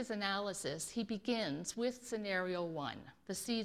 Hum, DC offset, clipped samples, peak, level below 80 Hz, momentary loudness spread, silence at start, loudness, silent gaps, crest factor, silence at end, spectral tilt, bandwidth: none; under 0.1%; under 0.1%; -20 dBFS; -72 dBFS; 6 LU; 0 s; -39 LUFS; none; 20 dB; 0 s; -3.5 dB/octave; 16 kHz